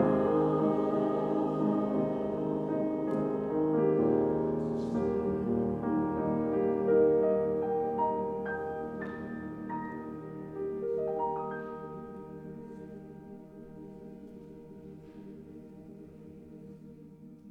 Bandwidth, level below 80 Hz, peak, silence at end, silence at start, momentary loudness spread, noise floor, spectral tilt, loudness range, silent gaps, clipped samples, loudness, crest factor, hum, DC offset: 5.6 kHz; -60 dBFS; -16 dBFS; 0 s; 0 s; 22 LU; -51 dBFS; -10 dB/octave; 19 LU; none; under 0.1%; -31 LUFS; 16 dB; none; under 0.1%